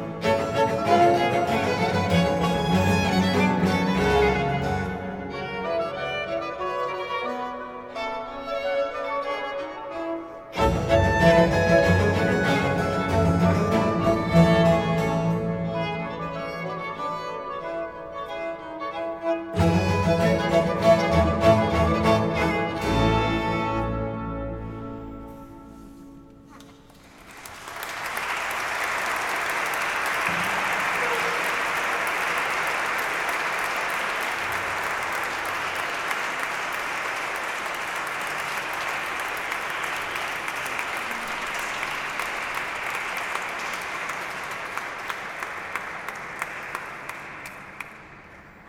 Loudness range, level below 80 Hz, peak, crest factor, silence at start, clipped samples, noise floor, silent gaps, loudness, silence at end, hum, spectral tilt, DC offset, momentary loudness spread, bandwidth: 10 LU; -42 dBFS; -4 dBFS; 20 dB; 0 s; under 0.1%; -49 dBFS; none; -24 LUFS; 0 s; none; -5.5 dB/octave; under 0.1%; 13 LU; 18.5 kHz